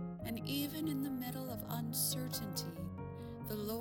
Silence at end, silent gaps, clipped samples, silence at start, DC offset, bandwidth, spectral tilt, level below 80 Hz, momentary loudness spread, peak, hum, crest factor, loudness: 0 s; none; under 0.1%; 0 s; under 0.1%; 18 kHz; -4.5 dB/octave; -62 dBFS; 10 LU; -24 dBFS; none; 16 dB; -40 LUFS